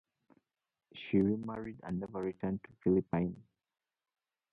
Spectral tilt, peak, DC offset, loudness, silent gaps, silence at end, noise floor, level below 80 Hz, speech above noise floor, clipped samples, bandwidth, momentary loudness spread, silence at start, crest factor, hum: -10 dB/octave; -18 dBFS; under 0.1%; -35 LUFS; none; 1.1 s; -72 dBFS; -62 dBFS; 38 dB; under 0.1%; 4.7 kHz; 14 LU; 0.95 s; 20 dB; none